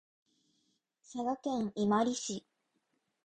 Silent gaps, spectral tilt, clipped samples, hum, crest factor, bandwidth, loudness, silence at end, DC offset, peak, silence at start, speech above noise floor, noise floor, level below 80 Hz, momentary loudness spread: none; -4.5 dB/octave; under 0.1%; none; 20 dB; 9.6 kHz; -34 LUFS; 0.85 s; under 0.1%; -18 dBFS; 1.1 s; 47 dB; -80 dBFS; -72 dBFS; 12 LU